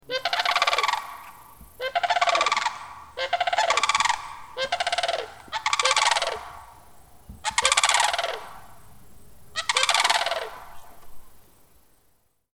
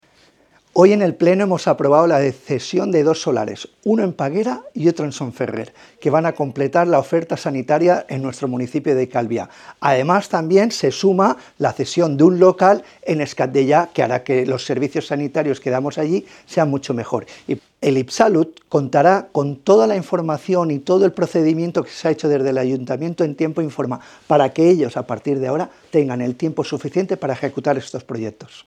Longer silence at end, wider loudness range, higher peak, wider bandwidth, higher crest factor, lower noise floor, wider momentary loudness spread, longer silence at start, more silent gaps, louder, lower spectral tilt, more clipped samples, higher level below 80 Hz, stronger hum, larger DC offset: first, 1.25 s vs 0.1 s; about the same, 3 LU vs 5 LU; about the same, 0 dBFS vs 0 dBFS; first, over 20 kHz vs 10.5 kHz; first, 26 dB vs 18 dB; first, -66 dBFS vs -55 dBFS; first, 17 LU vs 10 LU; second, 0.1 s vs 0.75 s; neither; second, -23 LUFS vs -18 LUFS; second, 1 dB/octave vs -6.5 dB/octave; neither; first, -56 dBFS vs -66 dBFS; neither; first, 0.2% vs under 0.1%